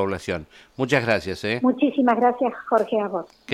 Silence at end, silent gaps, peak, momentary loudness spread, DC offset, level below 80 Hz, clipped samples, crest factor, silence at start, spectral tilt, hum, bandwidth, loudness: 0 s; none; -6 dBFS; 11 LU; under 0.1%; -56 dBFS; under 0.1%; 16 dB; 0 s; -6 dB/octave; none; 12.5 kHz; -22 LUFS